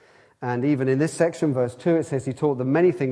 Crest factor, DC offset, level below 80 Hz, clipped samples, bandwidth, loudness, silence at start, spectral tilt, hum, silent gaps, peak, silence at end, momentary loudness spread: 16 dB; under 0.1%; -66 dBFS; under 0.1%; 11 kHz; -23 LUFS; 0.4 s; -7.5 dB/octave; none; none; -6 dBFS; 0 s; 6 LU